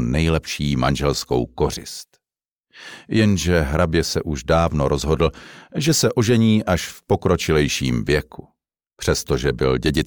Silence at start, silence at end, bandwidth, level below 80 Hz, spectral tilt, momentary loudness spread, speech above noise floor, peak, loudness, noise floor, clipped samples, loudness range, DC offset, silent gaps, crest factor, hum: 0 s; 0 s; over 20 kHz; -34 dBFS; -5 dB/octave; 8 LU; over 71 dB; -6 dBFS; -20 LUFS; under -90 dBFS; under 0.1%; 3 LU; 0.3%; 2.51-2.64 s; 14 dB; none